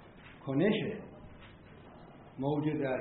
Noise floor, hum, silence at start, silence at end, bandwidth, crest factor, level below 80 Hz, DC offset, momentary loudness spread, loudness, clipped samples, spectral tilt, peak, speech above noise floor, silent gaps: -53 dBFS; none; 0 s; 0 s; 4.2 kHz; 18 dB; -62 dBFS; under 0.1%; 24 LU; -33 LUFS; under 0.1%; -6 dB/octave; -18 dBFS; 22 dB; none